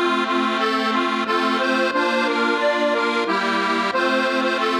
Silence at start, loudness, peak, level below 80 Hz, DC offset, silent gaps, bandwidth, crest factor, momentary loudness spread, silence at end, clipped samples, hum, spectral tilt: 0 s; -19 LUFS; -8 dBFS; -76 dBFS; under 0.1%; none; 13 kHz; 12 dB; 1 LU; 0 s; under 0.1%; none; -3.5 dB/octave